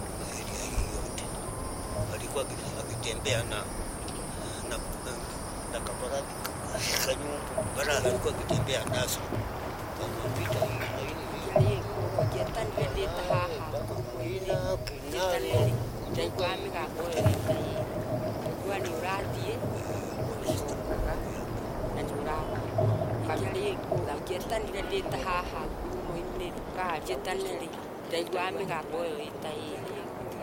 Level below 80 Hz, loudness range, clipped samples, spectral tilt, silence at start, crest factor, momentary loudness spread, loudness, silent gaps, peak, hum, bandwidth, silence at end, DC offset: -44 dBFS; 4 LU; under 0.1%; -5 dB/octave; 0 s; 22 dB; 8 LU; -32 LUFS; none; -10 dBFS; none; 17 kHz; 0 s; under 0.1%